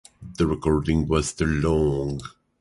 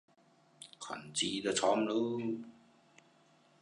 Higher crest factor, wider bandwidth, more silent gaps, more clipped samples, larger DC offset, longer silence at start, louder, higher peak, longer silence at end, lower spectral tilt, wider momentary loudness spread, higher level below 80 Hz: second, 16 dB vs 22 dB; about the same, 11.5 kHz vs 11 kHz; neither; neither; neither; second, 0.2 s vs 0.6 s; first, -23 LUFS vs -35 LUFS; first, -8 dBFS vs -16 dBFS; second, 0.35 s vs 1.1 s; first, -6.5 dB/octave vs -3 dB/octave; second, 12 LU vs 22 LU; first, -34 dBFS vs -76 dBFS